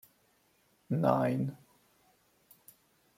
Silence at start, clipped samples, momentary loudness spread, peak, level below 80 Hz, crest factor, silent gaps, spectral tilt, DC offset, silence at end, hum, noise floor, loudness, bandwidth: 0.9 s; under 0.1%; 12 LU; -12 dBFS; -74 dBFS; 24 dB; none; -8.5 dB/octave; under 0.1%; 1.65 s; none; -71 dBFS; -31 LUFS; 16.5 kHz